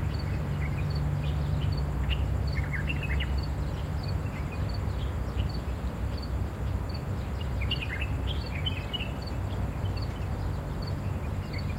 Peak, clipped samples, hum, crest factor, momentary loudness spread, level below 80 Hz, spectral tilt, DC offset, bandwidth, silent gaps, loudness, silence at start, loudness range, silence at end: -16 dBFS; under 0.1%; none; 14 dB; 4 LU; -34 dBFS; -6.5 dB/octave; under 0.1%; 16 kHz; none; -32 LUFS; 0 s; 3 LU; 0 s